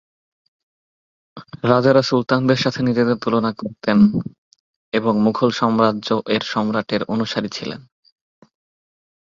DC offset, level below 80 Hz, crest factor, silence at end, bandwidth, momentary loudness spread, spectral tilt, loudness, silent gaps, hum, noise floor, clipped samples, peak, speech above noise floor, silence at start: under 0.1%; -56 dBFS; 18 dB; 1.55 s; 7.4 kHz; 11 LU; -6.5 dB/octave; -18 LUFS; 4.38-4.51 s, 4.60-4.92 s; none; under -90 dBFS; under 0.1%; -2 dBFS; over 72 dB; 1.35 s